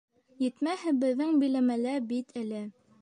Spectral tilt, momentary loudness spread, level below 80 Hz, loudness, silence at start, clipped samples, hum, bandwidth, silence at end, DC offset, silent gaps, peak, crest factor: -5.5 dB/octave; 11 LU; -82 dBFS; -30 LUFS; 0.4 s; under 0.1%; none; 10 kHz; 0.3 s; under 0.1%; none; -18 dBFS; 12 dB